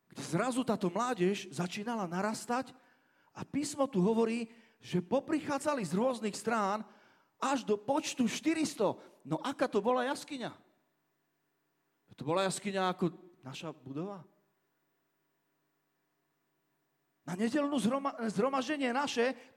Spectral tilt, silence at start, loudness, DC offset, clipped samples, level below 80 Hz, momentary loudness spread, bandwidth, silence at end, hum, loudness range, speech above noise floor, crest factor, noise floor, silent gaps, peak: -5 dB/octave; 0.15 s; -34 LUFS; under 0.1%; under 0.1%; -78 dBFS; 13 LU; 16.5 kHz; 0.1 s; none; 8 LU; 46 dB; 18 dB; -80 dBFS; none; -18 dBFS